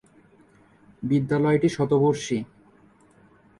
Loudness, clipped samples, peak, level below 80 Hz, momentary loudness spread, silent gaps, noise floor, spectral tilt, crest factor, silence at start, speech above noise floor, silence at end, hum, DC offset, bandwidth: -23 LUFS; under 0.1%; -8 dBFS; -60 dBFS; 11 LU; none; -56 dBFS; -7 dB/octave; 16 dB; 1 s; 34 dB; 1.15 s; none; under 0.1%; 11.5 kHz